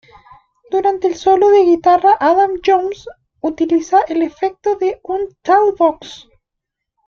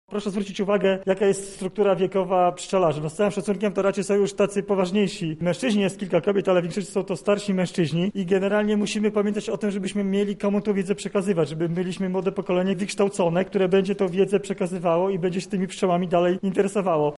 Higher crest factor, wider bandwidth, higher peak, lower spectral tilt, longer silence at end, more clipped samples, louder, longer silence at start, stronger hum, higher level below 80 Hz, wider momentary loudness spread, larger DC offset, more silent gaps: about the same, 14 dB vs 14 dB; second, 7 kHz vs 11.5 kHz; first, -2 dBFS vs -8 dBFS; second, -4.5 dB/octave vs -6 dB/octave; first, 0.9 s vs 0 s; neither; first, -14 LUFS vs -23 LUFS; first, 0.7 s vs 0.1 s; neither; first, -52 dBFS vs -58 dBFS; first, 12 LU vs 5 LU; neither; neither